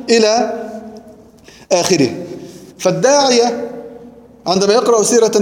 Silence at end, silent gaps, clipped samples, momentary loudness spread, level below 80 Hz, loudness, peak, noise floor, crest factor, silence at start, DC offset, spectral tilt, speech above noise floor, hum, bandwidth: 0 s; none; under 0.1%; 21 LU; -56 dBFS; -13 LUFS; 0 dBFS; -42 dBFS; 14 dB; 0 s; under 0.1%; -3.5 dB/octave; 29 dB; none; 16.5 kHz